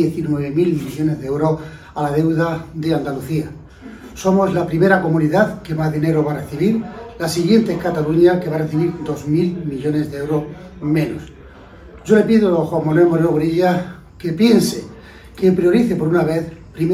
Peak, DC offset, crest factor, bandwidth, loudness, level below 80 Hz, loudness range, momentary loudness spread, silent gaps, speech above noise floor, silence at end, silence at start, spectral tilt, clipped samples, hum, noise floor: 0 dBFS; under 0.1%; 18 dB; 15 kHz; -17 LUFS; -44 dBFS; 4 LU; 12 LU; none; 23 dB; 0 s; 0 s; -7 dB/octave; under 0.1%; none; -40 dBFS